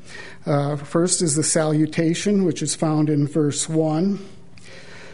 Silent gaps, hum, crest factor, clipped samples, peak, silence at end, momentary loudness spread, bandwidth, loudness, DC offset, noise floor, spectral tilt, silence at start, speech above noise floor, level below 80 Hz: none; none; 16 dB; under 0.1%; -6 dBFS; 0 s; 10 LU; 11 kHz; -20 LUFS; 1%; -44 dBFS; -5 dB/octave; 0.05 s; 24 dB; -58 dBFS